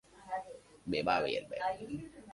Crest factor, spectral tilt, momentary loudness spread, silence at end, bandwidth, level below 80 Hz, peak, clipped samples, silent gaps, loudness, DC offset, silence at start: 20 dB; -5 dB/octave; 13 LU; 0 s; 11.5 kHz; -64 dBFS; -18 dBFS; under 0.1%; none; -37 LUFS; under 0.1%; 0.15 s